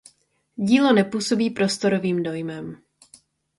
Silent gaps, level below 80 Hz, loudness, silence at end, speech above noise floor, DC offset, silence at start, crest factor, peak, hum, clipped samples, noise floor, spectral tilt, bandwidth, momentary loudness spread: none; -64 dBFS; -21 LUFS; 0.85 s; 41 dB; under 0.1%; 0.6 s; 18 dB; -4 dBFS; none; under 0.1%; -62 dBFS; -5 dB/octave; 11.5 kHz; 17 LU